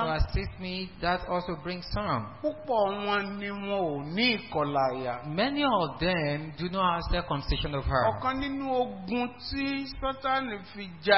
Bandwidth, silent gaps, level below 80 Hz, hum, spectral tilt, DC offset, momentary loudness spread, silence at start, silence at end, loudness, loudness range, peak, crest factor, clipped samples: 5.8 kHz; none; -42 dBFS; none; -9.5 dB/octave; 0.2%; 8 LU; 0 s; 0 s; -30 LUFS; 3 LU; -6 dBFS; 22 dB; under 0.1%